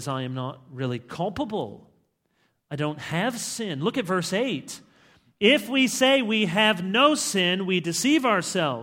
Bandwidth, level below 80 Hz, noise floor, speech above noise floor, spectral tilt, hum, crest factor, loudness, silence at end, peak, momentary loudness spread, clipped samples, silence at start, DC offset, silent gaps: 17 kHz; -64 dBFS; -70 dBFS; 46 dB; -3.5 dB/octave; none; 20 dB; -24 LUFS; 0 s; -4 dBFS; 13 LU; under 0.1%; 0 s; under 0.1%; none